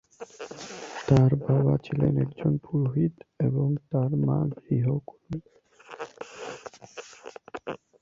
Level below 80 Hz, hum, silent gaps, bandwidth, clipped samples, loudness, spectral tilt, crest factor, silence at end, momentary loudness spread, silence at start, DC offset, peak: -54 dBFS; none; none; 7.6 kHz; under 0.1%; -26 LUFS; -8.5 dB/octave; 22 dB; 0.25 s; 19 LU; 0.2 s; under 0.1%; -6 dBFS